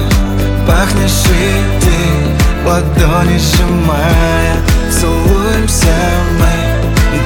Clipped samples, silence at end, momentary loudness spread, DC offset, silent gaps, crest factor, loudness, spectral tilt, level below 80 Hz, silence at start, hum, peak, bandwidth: under 0.1%; 0 s; 2 LU; under 0.1%; none; 10 dB; -11 LUFS; -5 dB/octave; -14 dBFS; 0 s; none; 0 dBFS; 18.5 kHz